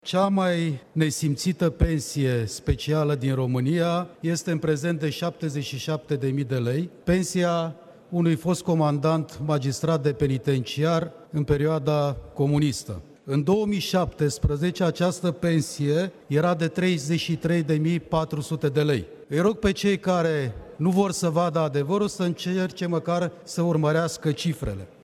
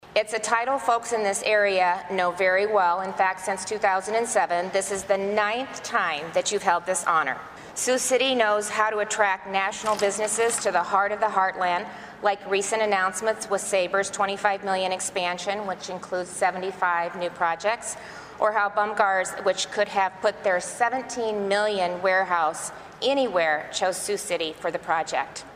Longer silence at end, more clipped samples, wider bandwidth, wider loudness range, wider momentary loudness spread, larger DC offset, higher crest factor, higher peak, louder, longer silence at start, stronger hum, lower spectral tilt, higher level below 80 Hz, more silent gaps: first, 0.15 s vs 0 s; neither; second, 13.5 kHz vs 15.5 kHz; about the same, 2 LU vs 3 LU; about the same, 5 LU vs 7 LU; neither; about the same, 18 dB vs 20 dB; about the same, -6 dBFS vs -6 dBFS; about the same, -25 LUFS vs -24 LUFS; about the same, 0.05 s vs 0.05 s; neither; first, -6 dB/octave vs -2 dB/octave; first, -42 dBFS vs -64 dBFS; neither